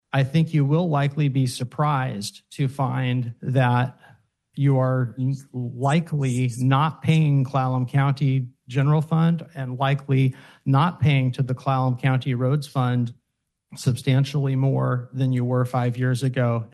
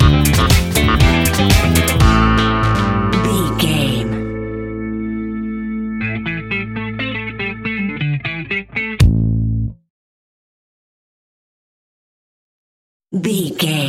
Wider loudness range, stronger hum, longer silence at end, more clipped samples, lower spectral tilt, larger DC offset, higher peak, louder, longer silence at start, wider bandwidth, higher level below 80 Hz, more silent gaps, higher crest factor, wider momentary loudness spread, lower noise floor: second, 2 LU vs 11 LU; neither; about the same, 0.05 s vs 0 s; neither; first, -7.5 dB/octave vs -5 dB/octave; neither; second, -6 dBFS vs 0 dBFS; second, -23 LUFS vs -16 LUFS; first, 0.15 s vs 0 s; second, 12 kHz vs 16.5 kHz; second, -60 dBFS vs -24 dBFS; second, none vs 9.90-13.00 s; about the same, 16 dB vs 16 dB; second, 7 LU vs 11 LU; second, -78 dBFS vs under -90 dBFS